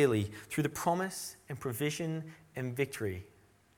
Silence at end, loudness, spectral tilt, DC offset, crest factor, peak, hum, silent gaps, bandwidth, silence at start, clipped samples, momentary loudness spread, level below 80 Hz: 0.5 s; -36 LUFS; -5.5 dB/octave; under 0.1%; 20 dB; -14 dBFS; none; none; 19 kHz; 0 s; under 0.1%; 9 LU; -66 dBFS